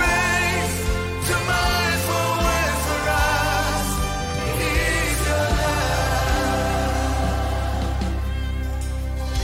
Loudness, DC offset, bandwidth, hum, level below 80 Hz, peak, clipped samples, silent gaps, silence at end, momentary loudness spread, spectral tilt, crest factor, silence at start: -22 LUFS; under 0.1%; 16 kHz; none; -26 dBFS; -8 dBFS; under 0.1%; none; 0 s; 7 LU; -4 dB/octave; 14 dB; 0 s